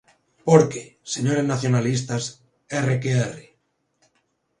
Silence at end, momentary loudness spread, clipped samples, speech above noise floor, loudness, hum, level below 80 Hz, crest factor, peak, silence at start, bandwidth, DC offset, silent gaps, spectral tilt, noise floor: 1.2 s; 14 LU; under 0.1%; 49 dB; -22 LUFS; none; -60 dBFS; 22 dB; 0 dBFS; 0.45 s; 11 kHz; under 0.1%; none; -6 dB/octave; -70 dBFS